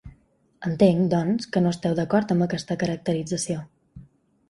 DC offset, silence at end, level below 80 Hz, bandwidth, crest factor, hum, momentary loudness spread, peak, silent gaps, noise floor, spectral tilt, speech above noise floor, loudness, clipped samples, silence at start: under 0.1%; 0.45 s; -56 dBFS; 11.5 kHz; 20 dB; none; 10 LU; -6 dBFS; none; -60 dBFS; -6.5 dB/octave; 37 dB; -24 LUFS; under 0.1%; 0.05 s